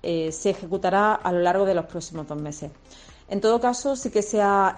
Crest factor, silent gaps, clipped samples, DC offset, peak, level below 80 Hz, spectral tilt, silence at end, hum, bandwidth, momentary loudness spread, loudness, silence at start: 16 dB; none; under 0.1%; under 0.1%; -8 dBFS; -52 dBFS; -4.5 dB/octave; 0 s; none; 10 kHz; 13 LU; -23 LUFS; 0.05 s